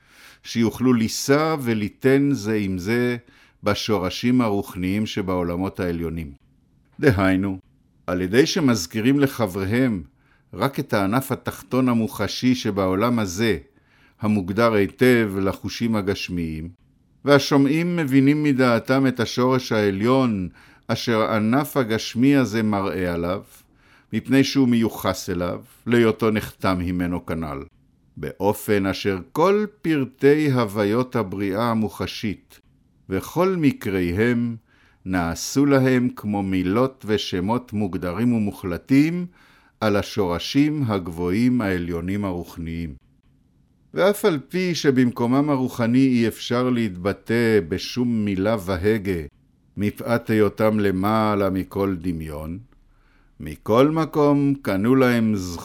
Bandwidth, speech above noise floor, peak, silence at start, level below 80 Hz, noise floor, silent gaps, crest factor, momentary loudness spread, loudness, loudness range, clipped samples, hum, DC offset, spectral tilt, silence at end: 17 kHz; 38 dB; -2 dBFS; 0.45 s; -50 dBFS; -59 dBFS; none; 20 dB; 11 LU; -21 LUFS; 4 LU; under 0.1%; none; under 0.1%; -6 dB/octave; 0 s